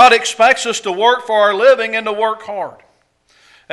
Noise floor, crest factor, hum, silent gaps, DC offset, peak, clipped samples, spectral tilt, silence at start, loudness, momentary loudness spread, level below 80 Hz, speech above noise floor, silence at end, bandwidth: -57 dBFS; 14 dB; none; none; under 0.1%; 0 dBFS; 0.1%; -1 dB/octave; 0 s; -13 LUFS; 13 LU; -58 dBFS; 43 dB; 1 s; 12 kHz